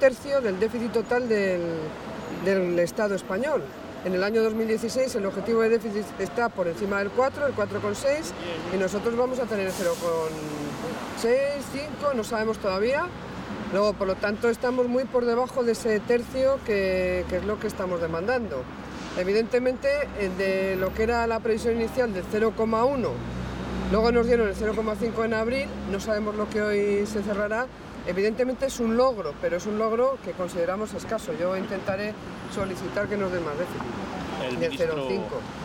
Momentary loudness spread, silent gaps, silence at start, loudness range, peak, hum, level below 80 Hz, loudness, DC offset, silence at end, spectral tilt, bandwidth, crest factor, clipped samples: 9 LU; none; 0 s; 3 LU; -8 dBFS; none; -46 dBFS; -26 LUFS; under 0.1%; 0 s; -5.5 dB/octave; 17.5 kHz; 18 dB; under 0.1%